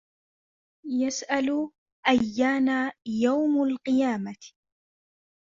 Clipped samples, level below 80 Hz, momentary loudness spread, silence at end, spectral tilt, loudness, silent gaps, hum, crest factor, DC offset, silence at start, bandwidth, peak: under 0.1%; -66 dBFS; 10 LU; 0.95 s; -4 dB/octave; -26 LUFS; 1.78-1.86 s, 1.92-2.03 s; none; 20 dB; under 0.1%; 0.85 s; 7.6 kHz; -8 dBFS